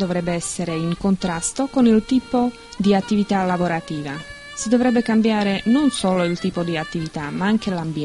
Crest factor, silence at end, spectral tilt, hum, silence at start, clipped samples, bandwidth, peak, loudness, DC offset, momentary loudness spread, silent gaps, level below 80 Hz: 16 dB; 0 s; -5.5 dB/octave; none; 0 s; under 0.1%; 11.5 kHz; -4 dBFS; -20 LUFS; under 0.1%; 9 LU; none; -46 dBFS